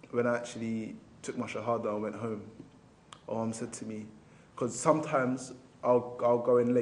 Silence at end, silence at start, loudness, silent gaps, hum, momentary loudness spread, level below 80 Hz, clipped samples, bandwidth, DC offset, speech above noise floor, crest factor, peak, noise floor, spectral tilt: 0 s; 0.05 s; -32 LUFS; none; none; 17 LU; -72 dBFS; under 0.1%; 11 kHz; under 0.1%; 25 dB; 22 dB; -10 dBFS; -56 dBFS; -6 dB/octave